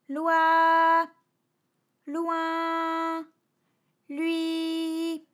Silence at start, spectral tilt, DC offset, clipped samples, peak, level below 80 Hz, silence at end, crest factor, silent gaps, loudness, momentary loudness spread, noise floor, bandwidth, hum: 0.1 s; -2 dB/octave; under 0.1%; under 0.1%; -12 dBFS; under -90 dBFS; 0.15 s; 16 dB; none; -25 LUFS; 13 LU; -76 dBFS; 14.5 kHz; none